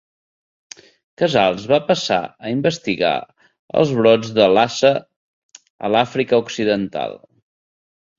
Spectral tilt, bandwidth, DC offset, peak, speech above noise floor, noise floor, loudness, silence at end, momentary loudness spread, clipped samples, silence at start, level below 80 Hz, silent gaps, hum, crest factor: -5 dB/octave; 7.6 kHz; under 0.1%; 0 dBFS; over 73 dB; under -90 dBFS; -18 LUFS; 1 s; 10 LU; under 0.1%; 1.2 s; -58 dBFS; 3.59-3.68 s, 5.16-5.49 s, 5.70-5.79 s; none; 18 dB